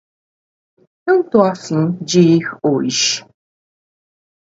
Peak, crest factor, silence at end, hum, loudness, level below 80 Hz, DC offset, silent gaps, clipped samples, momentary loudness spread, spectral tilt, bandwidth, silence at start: 0 dBFS; 18 dB; 1.3 s; none; -15 LUFS; -62 dBFS; under 0.1%; none; under 0.1%; 7 LU; -4.5 dB/octave; 8 kHz; 1.05 s